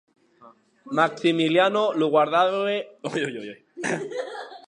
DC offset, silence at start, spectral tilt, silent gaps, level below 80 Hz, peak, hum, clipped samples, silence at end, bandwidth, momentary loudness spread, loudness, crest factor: under 0.1%; 0.45 s; -5 dB/octave; none; -80 dBFS; -4 dBFS; none; under 0.1%; 0.1 s; 10.5 kHz; 13 LU; -23 LUFS; 20 dB